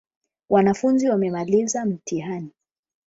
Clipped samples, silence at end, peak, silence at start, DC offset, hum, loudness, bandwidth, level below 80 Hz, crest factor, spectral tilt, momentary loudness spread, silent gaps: under 0.1%; 0.6 s; -6 dBFS; 0.5 s; under 0.1%; none; -22 LUFS; 8 kHz; -60 dBFS; 18 dB; -6 dB/octave; 12 LU; none